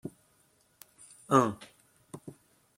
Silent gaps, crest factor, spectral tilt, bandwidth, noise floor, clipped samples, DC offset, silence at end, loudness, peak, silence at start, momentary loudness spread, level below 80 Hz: none; 28 dB; -6 dB/octave; 16.5 kHz; -68 dBFS; under 0.1%; under 0.1%; 0.45 s; -27 LUFS; -8 dBFS; 0.05 s; 27 LU; -74 dBFS